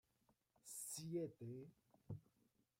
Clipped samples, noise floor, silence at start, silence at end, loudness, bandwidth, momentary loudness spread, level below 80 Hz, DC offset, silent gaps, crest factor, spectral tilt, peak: under 0.1%; -83 dBFS; 0.65 s; 0.6 s; -52 LUFS; 16 kHz; 13 LU; -84 dBFS; under 0.1%; none; 18 dB; -5 dB/octave; -36 dBFS